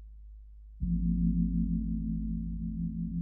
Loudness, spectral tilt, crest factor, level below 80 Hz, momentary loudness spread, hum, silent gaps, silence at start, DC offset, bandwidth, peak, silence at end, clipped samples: -33 LUFS; -18 dB/octave; 14 dB; -38 dBFS; 23 LU; none; none; 0 s; under 0.1%; 0.5 kHz; -18 dBFS; 0 s; under 0.1%